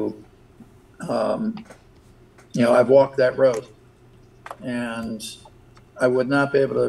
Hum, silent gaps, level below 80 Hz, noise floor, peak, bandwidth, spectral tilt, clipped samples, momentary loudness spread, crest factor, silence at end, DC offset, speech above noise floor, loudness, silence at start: none; none; -58 dBFS; -51 dBFS; -4 dBFS; 12.5 kHz; -6 dB/octave; under 0.1%; 20 LU; 18 dB; 0 s; under 0.1%; 30 dB; -21 LUFS; 0 s